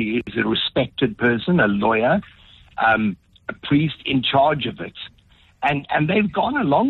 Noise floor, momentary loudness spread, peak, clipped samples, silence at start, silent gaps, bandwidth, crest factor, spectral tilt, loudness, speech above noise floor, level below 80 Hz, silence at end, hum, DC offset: -54 dBFS; 15 LU; -6 dBFS; under 0.1%; 0 s; none; 4.4 kHz; 16 dB; -8.5 dB/octave; -20 LUFS; 34 dB; -50 dBFS; 0 s; none; under 0.1%